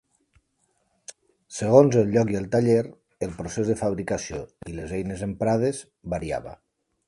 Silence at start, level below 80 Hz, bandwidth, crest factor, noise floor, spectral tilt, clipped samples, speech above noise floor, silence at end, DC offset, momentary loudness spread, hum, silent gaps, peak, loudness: 1.5 s; -50 dBFS; 11.5 kHz; 24 dB; -71 dBFS; -6.5 dB/octave; under 0.1%; 47 dB; 0.55 s; under 0.1%; 19 LU; none; none; -2 dBFS; -24 LUFS